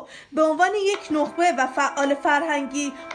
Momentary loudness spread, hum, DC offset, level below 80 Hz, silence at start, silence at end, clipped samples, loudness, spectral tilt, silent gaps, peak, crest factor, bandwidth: 6 LU; none; under 0.1%; -66 dBFS; 0 s; 0 s; under 0.1%; -22 LUFS; -2 dB/octave; none; -6 dBFS; 16 dB; 11 kHz